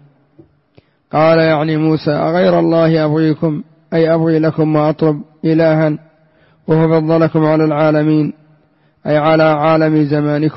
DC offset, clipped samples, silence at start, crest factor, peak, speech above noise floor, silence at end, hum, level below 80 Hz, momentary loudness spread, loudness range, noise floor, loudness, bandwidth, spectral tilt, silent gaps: under 0.1%; under 0.1%; 1.15 s; 10 dB; -2 dBFS; 42 dB; 0 s; none; -52 dBFS; 7 LU; 1 LU; -54 dBFS; -13 LUFS; 5.8 kHz; -12.5 dB/octave; none